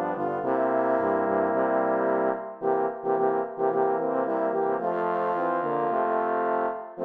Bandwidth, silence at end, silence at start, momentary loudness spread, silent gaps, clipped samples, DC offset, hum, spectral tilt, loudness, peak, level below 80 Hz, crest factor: 4.4 kHz; 0 s; 0 s; 3 LU; none; under 0.1%; under 0.1%; none; -9.5 dB/octave; -26 LUFS; -12 dBFS; -78 dBFS; 14 dB